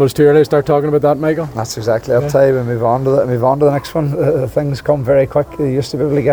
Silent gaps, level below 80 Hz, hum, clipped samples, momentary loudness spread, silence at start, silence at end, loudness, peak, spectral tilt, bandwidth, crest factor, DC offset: none; -42 dBFS; none; under 0.1%; 6 LU; 0 s; 0 s; -14 LUFS; 0 dBFS; -7 dB/octave; over 20 kHz; 12 dB; under 0.1%